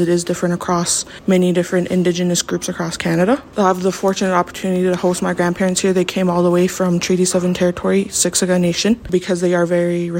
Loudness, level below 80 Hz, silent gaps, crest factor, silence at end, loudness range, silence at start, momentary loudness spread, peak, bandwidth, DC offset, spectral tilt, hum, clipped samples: -17 LUFS; -48 dBFS; none; 14 dB; 0 s; 2 LU; 0 s; 3 LU; -2 dBFS; 16.5 kHz; under 0.1%; -5 dB/octave; none; under 0.1%